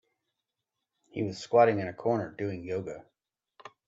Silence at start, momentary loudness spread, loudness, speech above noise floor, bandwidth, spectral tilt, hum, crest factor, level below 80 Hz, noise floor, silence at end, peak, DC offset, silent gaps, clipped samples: 1.15 s; 18 LU; -29 LUFS; 58 dB; 8 kHz; -7 dB/octave; none; 22 dB; -72 dBFS; -86 dBFS; 0.2 s; -10 dBFS; under 0.1%; none; under 0.1%